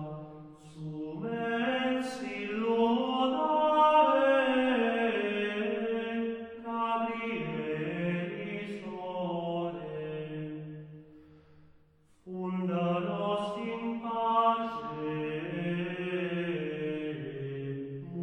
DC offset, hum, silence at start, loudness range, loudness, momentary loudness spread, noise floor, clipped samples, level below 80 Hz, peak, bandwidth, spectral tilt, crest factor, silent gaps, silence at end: under 0.1%; none; 0 s; 11 LU; -31 LUFS; 13 LU; -63 dBFS; under 0.1%; -70 dBFS; -12 dBFS; 10.5 kHz; -7 dB/octave; 18 dB; none; 0 s